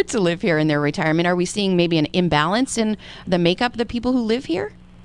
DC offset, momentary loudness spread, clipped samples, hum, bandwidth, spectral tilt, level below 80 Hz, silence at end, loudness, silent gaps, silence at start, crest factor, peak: under 0.1%; 6 LU; under 0.1%; none; 11.5 kHz; -5 dB/octave; -46 dBFS; 0 s; -20 LUFS; none; 0 s; 18 dB; -2 dBFS